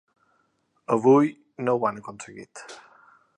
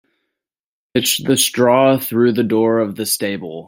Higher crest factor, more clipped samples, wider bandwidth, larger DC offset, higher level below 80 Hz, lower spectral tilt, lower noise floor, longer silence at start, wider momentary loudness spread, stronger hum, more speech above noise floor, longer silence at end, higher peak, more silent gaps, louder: about the same, 18 dB vs 16 dB; neither; second, 10 kHz vs 16.5 kHz; neither; second, -74 dBFS vs -60 dBFS; first, -7 dB/octave vs -4 dB/octave; second, -70 dBFS vs under -90 dBFS; about the same, 0.9 s vs 0.95 s; first, 23 LU vs 6 LU; neither; second, 47 dB vs over 74 dB; first, 0.6 s vs 0.05 s; second, -8 dBFS vs -2 dBFS; neither; second, -23 LUFS vs -16 LUFS